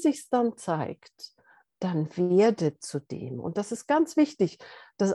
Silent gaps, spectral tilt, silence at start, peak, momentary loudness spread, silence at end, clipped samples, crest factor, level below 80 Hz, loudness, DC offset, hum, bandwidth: none; -6.5 dB/octave; 0 s; -12 dBFS; 22 LU; 0 s; under 0.1%; 16 dB; -74 dBFS; -27 LUFS; under 0.1%; none; 12.5 kHz